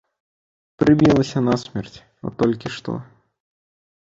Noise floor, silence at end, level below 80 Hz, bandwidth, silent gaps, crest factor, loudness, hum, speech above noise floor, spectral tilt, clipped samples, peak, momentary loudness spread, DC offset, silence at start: under -90 dBFS; 1.15 s; -50 dBFS; 7.8 kHz; none; 18 dB; -19 LUFS; none; over 71 dB; -7 dB/octave; under 0.1%; -4 dBFS; 18 LU; under 0.1%; 0.8 s